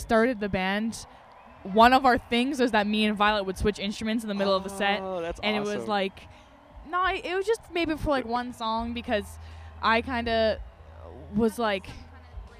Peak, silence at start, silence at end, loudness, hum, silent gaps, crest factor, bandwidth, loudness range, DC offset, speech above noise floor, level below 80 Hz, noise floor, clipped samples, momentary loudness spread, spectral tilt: -4 dBFS; 0 s; 0 s; -26 LUFS; none; none; 22 dB; 15 kHz; 5 LU; under 0.1%; 23 dB; -46 dBFS; -49 dBFS; under 0.1%; 17 LU; -5 dB/octave